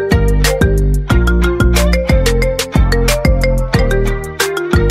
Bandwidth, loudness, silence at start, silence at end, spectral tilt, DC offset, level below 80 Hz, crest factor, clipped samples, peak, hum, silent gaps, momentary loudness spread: 16 kHz; -14 LUFS; 0 s; 0 s; -5.5 dB/octave; under 0.1%; -14 dBFS; 12 dB; under 0.1%; 0 dBFS; none; none; 4 LU